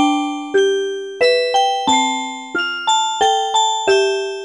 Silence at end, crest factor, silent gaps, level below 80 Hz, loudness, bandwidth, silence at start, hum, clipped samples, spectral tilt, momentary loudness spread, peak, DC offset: 0 s; 14 dB; none; -64 dBFS; -16 LUFS; 11 kHz; 0 s; none; under 0.1%; -1 dB/octave; 6 LU; -4 dBFS; under 0.1%